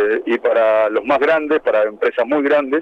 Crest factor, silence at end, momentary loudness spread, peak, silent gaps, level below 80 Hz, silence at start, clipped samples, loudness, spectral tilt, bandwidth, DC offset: 12 dB; 0 s; 3 LU; -4 dBFS; none; -58 dBFS; 0 s; under 0.1%; -16 LUFS; -6 dB/octave; 6.6 kHz; under 0.1%